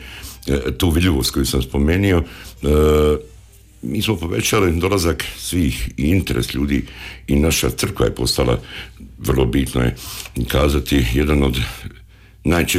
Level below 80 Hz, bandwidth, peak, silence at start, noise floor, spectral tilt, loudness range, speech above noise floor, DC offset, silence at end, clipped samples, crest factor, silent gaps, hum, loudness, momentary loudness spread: -26 dBFS; 16 kHz; -6 dBFS; 0 s; -44 dBFS; -5 dB/octave; 2 LU; 26 dB; under 0.1%; 0 s; under 0.1%; 12 dB; none; none; -18 LUFS; 12 LU